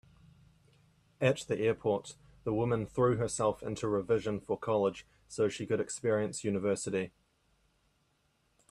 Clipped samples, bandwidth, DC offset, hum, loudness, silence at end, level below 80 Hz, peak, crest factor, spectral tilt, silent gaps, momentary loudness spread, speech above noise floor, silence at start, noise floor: under 0.1%; 12.5 kHz; under 0.1%; none; -33 LUFS; 1.65 s; -62 dBFS; -14 dBFS; 20 dB; -5.5 dB/octave; none; 7 LU; 42 dB; 1.2 s; -74 dBFS